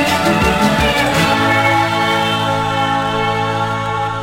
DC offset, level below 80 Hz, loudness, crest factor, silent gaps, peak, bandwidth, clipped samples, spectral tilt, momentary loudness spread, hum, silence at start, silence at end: under 0.1%; -34 dBFS; -14 LUFS; 12 dB; none; -2 dBFS; 16.5 kHz; under 0.1%; -4.5 dB/octave; 5 LU; none; 0 s; 0 s